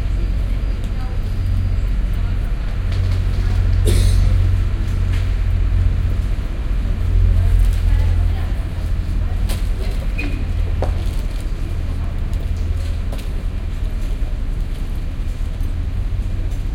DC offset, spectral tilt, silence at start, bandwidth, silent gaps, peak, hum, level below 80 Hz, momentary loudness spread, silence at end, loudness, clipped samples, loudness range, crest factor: under 0.1%; -6.5 dB/octave; 0 s; 13 kHz; none; -4 dBFS; none; -18 dBFS; 9 LU; 0 s; -21 LUFS; under 0.1%; 6 LU; 14 dB